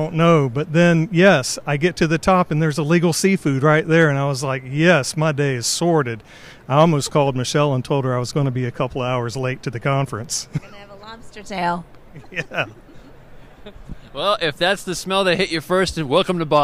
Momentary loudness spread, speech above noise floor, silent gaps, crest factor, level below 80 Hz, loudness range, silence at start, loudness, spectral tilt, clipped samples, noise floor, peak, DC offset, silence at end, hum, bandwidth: 13 LU; 22 dB; none; 16 dB; -46 dBFS; 10 LU; 0 s; -19 LUFS; -5 dB/octave; under 0.1%; -41 dBFS; -2 dBFS; under 0.1%; 0 s; none; 15 kHz